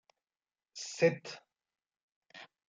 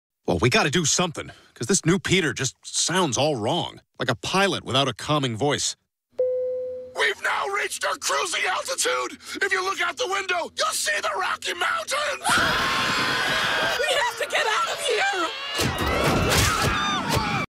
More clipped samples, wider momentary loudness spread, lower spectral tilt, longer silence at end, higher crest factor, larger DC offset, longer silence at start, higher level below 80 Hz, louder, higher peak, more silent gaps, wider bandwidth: neither; first, 23 LU vs 7 LU; first, -4.5 dB/octave vs -3 dB/octave; first, 0.25 s vs 0.05 s; first, 24 dB vs 18 dB; neither; first, 0.75 s vs 0.25 s; second, -88 dBFS vs -44 dBFS; second, -33 LUFS vs -23 LUFS; second, -14 dBFS vs -6 dBFS; first, 2.03-2.22 s vs none; second, 9.4 kHz vs 16 kHz